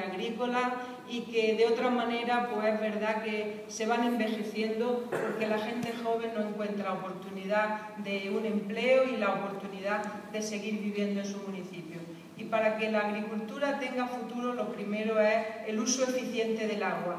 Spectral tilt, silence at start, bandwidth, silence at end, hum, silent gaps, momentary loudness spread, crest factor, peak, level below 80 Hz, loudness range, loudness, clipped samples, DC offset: -4.5 dB/octave; 0 s; 15 kHz; 0 s; none; none; 10 LU; 18 dB; -14 dBFS; -82 dBFS; 3 LU; -31 LUFS; under 0.1%; under 0.1%